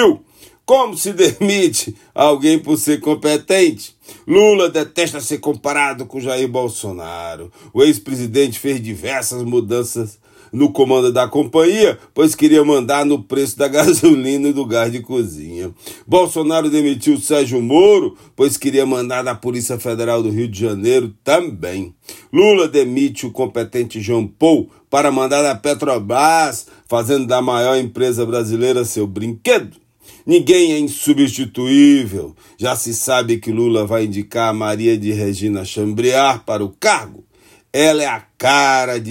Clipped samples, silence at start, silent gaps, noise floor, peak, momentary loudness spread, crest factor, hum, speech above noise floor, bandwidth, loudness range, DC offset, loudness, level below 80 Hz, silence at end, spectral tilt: under 0.1%; 0 s; none; -46 dBFS; 0 dBFS; 11 LU; 16 dB; none; 31 dB; 16.5 kHz; 4 LU; under 0.1%; -15 LUFS; -58 dBFS; 0 s; -4.5 dB/octave